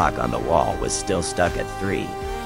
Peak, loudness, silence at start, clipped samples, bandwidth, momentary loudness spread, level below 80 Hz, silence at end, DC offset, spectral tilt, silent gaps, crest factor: -4 dBFS; -23 LUFS; 0 s; under 0.1%; 17 kHz; 6 LU; -36 dBFS; 0 s; under 0.1%; -4.5 dB/octave; none; 20 dB